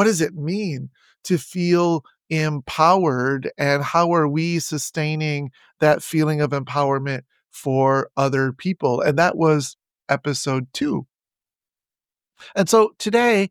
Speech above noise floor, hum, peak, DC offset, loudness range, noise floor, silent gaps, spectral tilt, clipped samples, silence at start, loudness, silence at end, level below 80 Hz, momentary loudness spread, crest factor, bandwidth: over 70 dB; none; -2 dBFS; under 0.1%; 3 LU; under -90 dBFS; none; -5.5 dB/octave; under 0.1%; 0 s; -20 LUFS; 0.05 s; -62 dBFS; 10 LU; 20 dB; 18 kHz